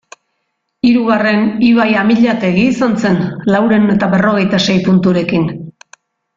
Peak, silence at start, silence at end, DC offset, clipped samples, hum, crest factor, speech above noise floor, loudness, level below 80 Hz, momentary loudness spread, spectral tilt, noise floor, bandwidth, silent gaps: 0 dBFS; 0.85 s; 0.65 s; under 0.1%; under 0.1%; none; 12 dB; 58 dB; -12 LUFS; -48 dBFS; 5 LU; -6.5 dB/octave; -69 dBFS; 7.6 kHz; none